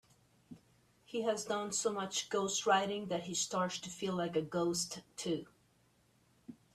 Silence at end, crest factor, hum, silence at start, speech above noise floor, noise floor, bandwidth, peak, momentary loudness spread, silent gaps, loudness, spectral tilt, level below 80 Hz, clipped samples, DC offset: 0.2 s; 20 dB; none; 0.5 s; 35 dB; -71 dBFS; 14.5 kHz; -18 dBFS; 9 LU; none; -36 LUFS; -3 dB/octave; -74 dBFS; under 0.1%; under 0.1%